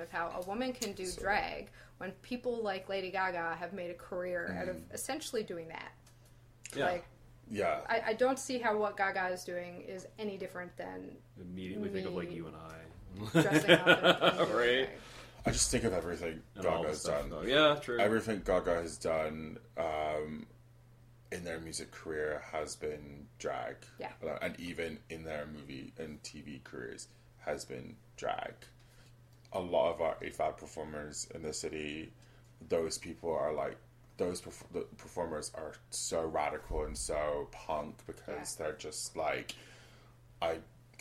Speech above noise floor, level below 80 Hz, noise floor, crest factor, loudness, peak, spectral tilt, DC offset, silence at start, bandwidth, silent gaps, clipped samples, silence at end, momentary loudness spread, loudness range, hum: 24 dB; -56 dBFS; -60 dBFS; 28 dB; -35 LUFS; -8 dBFS; -3.5 dB/octave; under 0.1%; 0 s; 16 kHz; none; under 0.1%; 0.2 s; 16 LU; 13 LU; none